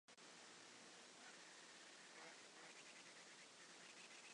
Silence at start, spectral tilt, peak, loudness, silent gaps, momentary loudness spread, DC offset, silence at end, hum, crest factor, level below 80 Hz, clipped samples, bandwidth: 0.1 s; -0.5 dB/octave; -48 dBFS; -61 LUFS; none; 2 LU; under 0.1%; 0 s; none; 16 dB; under -90 dBFS; under 0.1%; 11 kHz